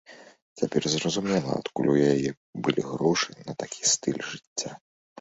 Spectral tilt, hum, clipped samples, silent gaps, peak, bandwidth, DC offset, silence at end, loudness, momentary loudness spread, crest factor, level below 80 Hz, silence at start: -4 dB/octave; none; under 0.1%; 0.42-0.56 s, 2.37-2.53 s, 4.47-4.56 s; -8 dBFS; 8.4 kHz; under 0.1%; 0.45 s; -27 LUFS; 11 LU; 20 dB; -64 dBFS; 0.1 s